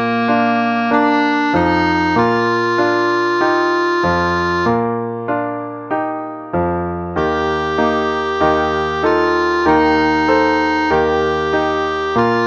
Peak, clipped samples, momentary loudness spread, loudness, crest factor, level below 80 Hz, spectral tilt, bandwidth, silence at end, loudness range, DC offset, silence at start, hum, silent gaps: -2 dBFS; under 0.1%; 7 LU; -16 LUFS; 14 dB; -40 dBFS; -6 dB/octave; 7.4 kHz; 0 s; 4 LU; under 0.1%; 0 s; none; none